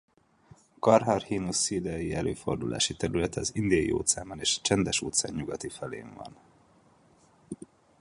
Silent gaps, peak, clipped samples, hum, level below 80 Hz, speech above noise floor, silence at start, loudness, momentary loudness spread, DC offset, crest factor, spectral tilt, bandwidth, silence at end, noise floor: none; -6 dBFS; under 0.1%; none; -52 dBFS; 33 dB; 0.85 s; -28 LUFS; 20 LU; under 0.1%; 24 dB; -3.5 dB/octave; 11.5 kHz; 0.45 s; -61 dBFS